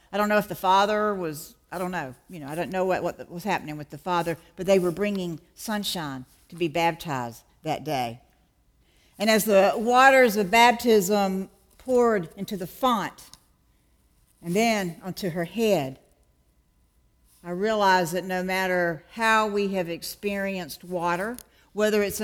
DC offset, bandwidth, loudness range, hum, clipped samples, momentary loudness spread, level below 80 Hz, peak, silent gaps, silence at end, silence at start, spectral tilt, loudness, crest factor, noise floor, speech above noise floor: under 0.1%; 19 kHz; 9 LU; none; under 0.1%; 16 LU; -58 dBFS; -4 dBFS; none; 0 s; 0.1 s; -4.5 dB/octave; -24 LUFS; 22 dB; -64 dBFS; 40 dB